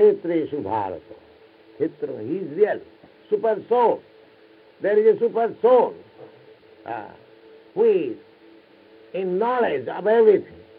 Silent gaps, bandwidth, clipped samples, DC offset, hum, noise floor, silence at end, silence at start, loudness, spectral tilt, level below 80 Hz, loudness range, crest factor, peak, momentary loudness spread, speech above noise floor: none; 4.7 kHz; under 0.1%; under 0.1%; none; -52 dBFS; 0.25 s; 0 s; -21 LUFS; -10 dB/octave; -72 dBFS; 6 LU; 18 dB; -6 dBFS; 16 LU; 31 dB